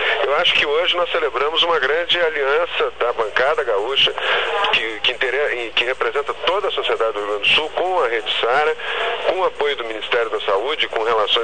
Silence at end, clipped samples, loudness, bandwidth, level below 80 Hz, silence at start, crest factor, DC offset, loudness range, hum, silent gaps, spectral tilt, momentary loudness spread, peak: 0 s; under 0.1%; -18 LUFS; 9.4 kHz; -54 dBFS; 0 s; 14 dB; 2%; 2 LU; none; none; -2 dB/octave; 5 LU; -4 dBFS